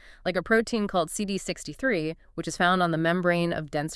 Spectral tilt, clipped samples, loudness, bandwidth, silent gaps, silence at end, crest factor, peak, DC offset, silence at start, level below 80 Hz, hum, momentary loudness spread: -5 dB/octave; under 0.1%; -26 LUFS; 12 kHz; none; 0 s; 18 dB; -8 dBFS; under 0.1%; 0.05 s; -52 dBFS; none; 9 LU